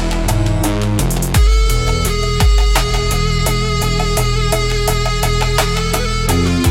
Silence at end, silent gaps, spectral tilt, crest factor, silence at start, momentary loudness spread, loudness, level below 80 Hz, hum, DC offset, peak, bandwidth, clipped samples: 0 s; none; -4.5 dB/octave; 12 dB; 0 s; 3 LU; -15 LUFS; -16 dBFS; none; under 0.1%; 0 dBFS; 16.5 kHz; under 0.1%